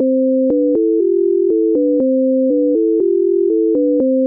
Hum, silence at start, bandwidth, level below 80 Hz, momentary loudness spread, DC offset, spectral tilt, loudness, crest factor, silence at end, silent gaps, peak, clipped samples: none; 0 s; 1.2 kHz; -60 dBFS; 0 LU; under 0.1%; -13.5 dB/octave; -14 LUFS; 6 dB; 0 s; none; -8 dBFS; under 0.1%